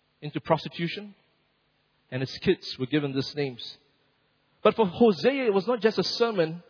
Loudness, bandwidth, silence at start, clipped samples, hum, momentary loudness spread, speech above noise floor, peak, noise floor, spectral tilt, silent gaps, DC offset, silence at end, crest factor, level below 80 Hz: -26 LUFS; 5.4 kHz; 0.2 s; under 0.1%; none; 14 LU; 44 dB; -6 dBFS; -70 dBFS; -6.5 dB/octave; none; under 0.1%; 0.1 s; 20 dB; -64 dBFS